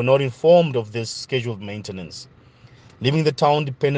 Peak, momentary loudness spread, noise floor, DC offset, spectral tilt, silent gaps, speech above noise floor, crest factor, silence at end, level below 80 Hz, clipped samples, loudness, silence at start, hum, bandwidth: -4 dBFS; 17 LU; -49 dBFS; under 0.1%; -6 dB/octave; none; 29 dB; 18 dB; 0 s; -60 dBFS; under 0.1%; -20 LUFS; 0 s; none; 9.6 kHz